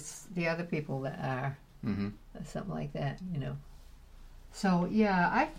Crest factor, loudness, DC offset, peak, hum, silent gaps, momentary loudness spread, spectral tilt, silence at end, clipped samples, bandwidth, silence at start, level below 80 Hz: 20 dB; -34 LUFS; under 0.1%; -14 dBFS; none; none; 13 LU; -6.5 dB/octave; 0 s; under 0.1%; 15 kHz; 0 s; -52 dBFS